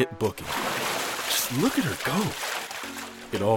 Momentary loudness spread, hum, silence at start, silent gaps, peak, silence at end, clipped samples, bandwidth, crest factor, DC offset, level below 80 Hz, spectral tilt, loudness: 9 LU; none; 0 s; none; -10 dBFS; 0 s; under 0.1%; 18 kHz; 18 dB; under 0.1%; -58 dBFS; -3.5 dB/octave; -27 LUFS